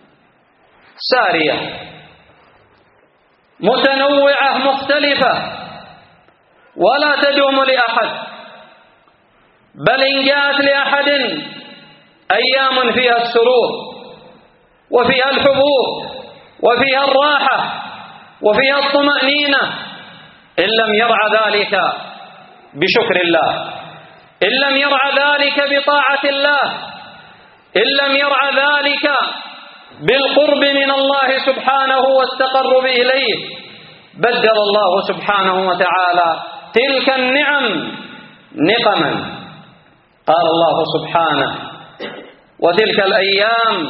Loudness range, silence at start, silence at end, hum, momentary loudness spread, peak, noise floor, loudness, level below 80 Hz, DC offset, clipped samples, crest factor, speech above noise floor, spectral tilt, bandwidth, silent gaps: 3 LU; 1 s; 0 s; none; 15 LU; 0 dBFS; -55 dBFS; -13 LUFS; -60 dBFS; under 0.1%; under 0.1%; 16 dB; 41 dB; -0.5 dB/octave; 5 kHz; none